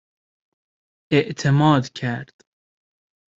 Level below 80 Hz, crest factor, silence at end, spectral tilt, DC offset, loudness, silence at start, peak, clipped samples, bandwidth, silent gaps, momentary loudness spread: -58 dBFS; 20 dB; 1.15 s; -6.5 dB/octave; under 0.1%; -20 LUFS; 1.1 s; -2 dBFS; under 0.1%; 7.8 kHz; none; 11 LU